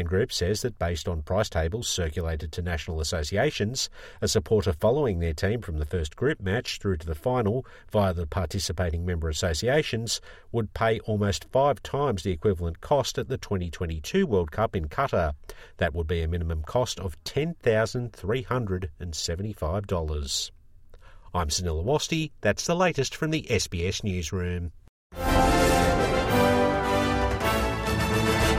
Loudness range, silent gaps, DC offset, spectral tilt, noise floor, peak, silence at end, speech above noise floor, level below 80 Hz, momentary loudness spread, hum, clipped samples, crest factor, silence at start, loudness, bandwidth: 5 LU; 24.89-25.10 s; under 0.1%; -5 dB/octave; -49 dBFS; -10 dBFS; 0 s; 22 dB; -38 dBFS; 8 LU; none; under 0.1%; 18 dB; 0 s; -27 LUFS; 16 kHz